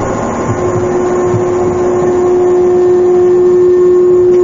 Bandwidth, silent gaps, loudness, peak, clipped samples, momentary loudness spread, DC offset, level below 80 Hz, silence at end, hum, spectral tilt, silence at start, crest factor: 7.6 kHz; none; -10 LUFS; -2 dBFS; under 0.1%; 6 LU; under 0.1%; -36 dBFS; 0 s; none; -7.5 dB/octave; 0 s; 8 dB